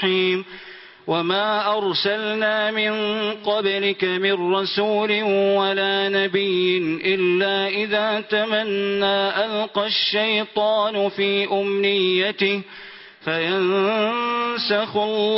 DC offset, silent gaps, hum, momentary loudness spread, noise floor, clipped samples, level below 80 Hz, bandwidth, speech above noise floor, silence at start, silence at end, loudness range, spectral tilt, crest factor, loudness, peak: under 0.1%; none; none; 4 LU; -42 dBFS; under 0.1%; -68 dBFS; 5.8 kHz; 21 dB; 0 s; 0 s; 2 LU; -8.5 dB/octave; 16 dB; -20 LUFS; -6 dBFS